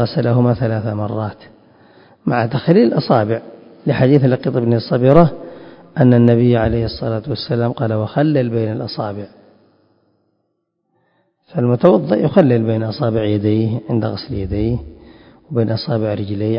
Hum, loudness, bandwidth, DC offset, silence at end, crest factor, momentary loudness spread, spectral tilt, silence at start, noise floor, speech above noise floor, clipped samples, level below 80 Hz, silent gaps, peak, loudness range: none; -16 LUFS; 5.4 kHz; under 0.1%; 0 s; 16 dB; 12 LU; -11 dB/octave; 0 s; -70 dBFS; 55 dB; under 0.1%; -40 dBFS; none; 0 dBFS; 7 LU